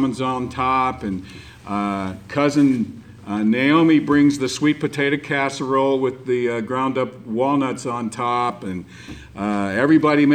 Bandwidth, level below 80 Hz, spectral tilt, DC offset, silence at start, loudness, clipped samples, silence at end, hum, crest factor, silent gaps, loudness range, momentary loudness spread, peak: 9.8 kHz; -52 dBFS; -6 dB/octave; under 0.1%; 0 s; -20 LUFS; under 0.1%; 0 s; none; 16 dB; none; 5 LU; 14 LU; -4 dBFS